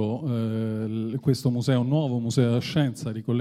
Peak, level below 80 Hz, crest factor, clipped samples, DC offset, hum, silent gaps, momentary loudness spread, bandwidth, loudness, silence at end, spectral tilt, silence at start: -8 dBFS; -62 dBFS; 16 dB; under 0.1%; under 0.1%; none; none; 5 LU; 14.5 kHz; -25 LUFS; 0 s; -7 dB/octave; 0 s